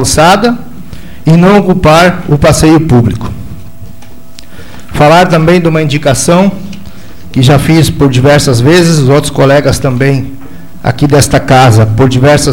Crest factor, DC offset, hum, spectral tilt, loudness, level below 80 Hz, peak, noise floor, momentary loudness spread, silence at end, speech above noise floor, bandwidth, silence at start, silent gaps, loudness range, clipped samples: 8 dB; 6%; none; -5.5 dB/octave; -6 LUFS; -26 dBFS; 0 dBFS; -32 dBFS; 13 LU; 0 s; 27 dB; 17 kHz; 0 s; none; 3 LU; 0.7%